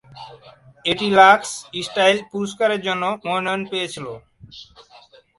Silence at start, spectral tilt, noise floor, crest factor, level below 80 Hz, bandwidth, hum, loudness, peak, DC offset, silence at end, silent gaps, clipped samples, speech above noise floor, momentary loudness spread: 0.1 s; -3.5 dB/octave; -49 dBFS; 20 dB; -60 dBFS; 11.5 kHz; none; -19 LUFS; 0 dBFS; under 0.1%; 0.75 s; none; under 0.1%; 30 dB; 22 LU